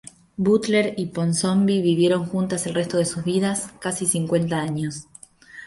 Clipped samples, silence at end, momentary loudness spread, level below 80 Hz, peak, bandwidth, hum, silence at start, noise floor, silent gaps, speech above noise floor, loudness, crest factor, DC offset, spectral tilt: under 0.1%; 0 s; 9 LU; -58 dBFS; -6 dBFS; 12 kHz; none; 0.4 s; -46 dBFS; none; 24 dB; -22 LUFS; 16 dB; under 0.1%; -5 dB/octave